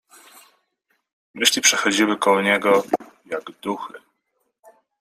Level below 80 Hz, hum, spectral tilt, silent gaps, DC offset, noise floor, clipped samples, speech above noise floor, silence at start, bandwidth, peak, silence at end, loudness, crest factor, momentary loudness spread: -70 dBFS; none; -1.5 dB/octave; none; under 0.1%; -73 dBFS; under 0.1%; 53 dB; 1.35 s; 16 kHz; -2 dBFS; 1 s; -19 LUFS; 22 dB; 16 LU